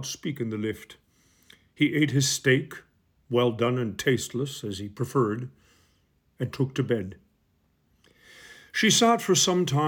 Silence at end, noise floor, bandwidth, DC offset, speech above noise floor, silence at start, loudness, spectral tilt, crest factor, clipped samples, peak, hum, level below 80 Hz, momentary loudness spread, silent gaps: 0 s; -68 dBFS; 19 kHz; under 0.1%; 43 dB; 0 s; -25 LUFS; -4 dB/octave; 18 dB; under 0.1%; -8 dBFS; none; -64 dBFS; 14 LU; none